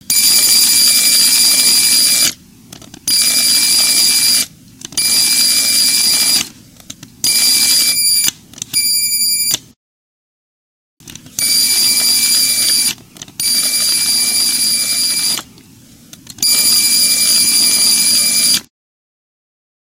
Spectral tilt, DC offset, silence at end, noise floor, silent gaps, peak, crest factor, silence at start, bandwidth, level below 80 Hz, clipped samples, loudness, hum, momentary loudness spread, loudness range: 2 dB/octave; under 0.1%; 1.35 s; -42 dBFS; 9.76-10.97 s; 0 dBFS; 14 dB; 0.1 s; over 20 kHz; -56 dBFS; under 0.1%; -9 LUFS; none; 9 LU; 4 LU